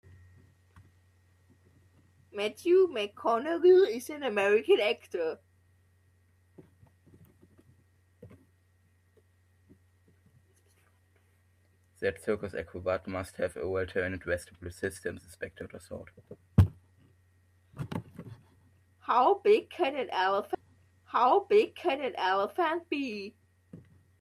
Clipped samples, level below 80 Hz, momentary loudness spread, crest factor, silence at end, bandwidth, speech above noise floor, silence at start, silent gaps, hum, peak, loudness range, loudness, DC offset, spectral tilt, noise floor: under 0.1%; -56 dBFS; 19 LU; 22 dB; 0.45 s; 14 kHz; 38 dB; 2.35 s; none; none; -10 dBFS; 11 LU; -29 LUFS; under 0.1%; -6.5 dB/octave; -67 dBFS